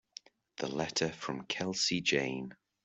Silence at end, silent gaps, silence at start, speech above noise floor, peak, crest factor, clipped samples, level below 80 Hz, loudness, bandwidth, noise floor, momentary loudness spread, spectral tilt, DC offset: 0.3 s; none; 0.6 s; 21 dB; -16 dBFS; 20 dB; under 0.1%; -70 dBFS; -34 LUFS; 8.2 kHz; -56 dBFS; 20 LU; -3 dB/octave; under 0.1%